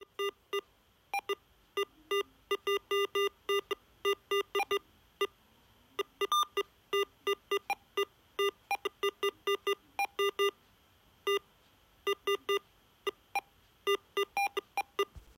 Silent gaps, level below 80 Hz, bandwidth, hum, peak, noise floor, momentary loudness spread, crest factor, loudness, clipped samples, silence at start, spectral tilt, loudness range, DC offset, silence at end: none; -70 dBFS; 16 kHz; none; -20 dBFS; -67 dBFS; 8 LU; 16 dB; -35 LUFS; under 0.1%; 0 s; -1.5 dB/octave; 2 LU; under 0.1%; 0.15 s